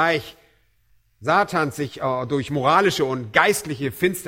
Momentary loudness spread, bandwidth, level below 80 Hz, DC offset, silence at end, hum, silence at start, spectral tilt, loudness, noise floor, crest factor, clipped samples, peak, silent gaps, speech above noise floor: 9 LU; 16.5 kHz; -56 dBFS; under 0.1%; 0 s; none; 0 s; -4.5 dB/octave; -21 LUFS; -63 dBFS; 22 dB; under 0.1%; 0 dBFS; none; 42 dB